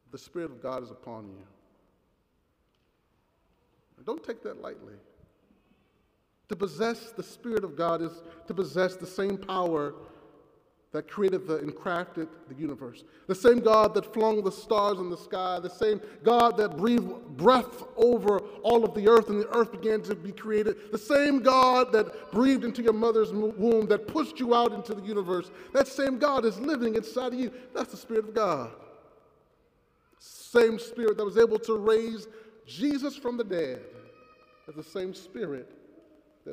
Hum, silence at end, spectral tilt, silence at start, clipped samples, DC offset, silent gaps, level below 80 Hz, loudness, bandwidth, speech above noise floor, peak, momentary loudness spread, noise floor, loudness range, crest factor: none; 0 s; -5.5 dB/octave; 0.15 s; under 0.1%; under 0.1%; none; -64 dBFS; -27 LUFS; 15.5 kHz; 45 dB; -8 dBFS; 17 LU; -72 dBFS; 16 LU; 20 dB